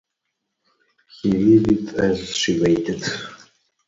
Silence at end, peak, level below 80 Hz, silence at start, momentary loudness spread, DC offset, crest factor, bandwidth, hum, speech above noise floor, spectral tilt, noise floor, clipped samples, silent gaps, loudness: 0.55 s; -4 dBFS; -48 dBFS; 1.25 s; 12 LU; under 0.1%; 18 dB; 7.8 kHz; none; 59 dB; -5.5 dB/octave; -78 dBFS; under 0.1%; none; -19 LUFS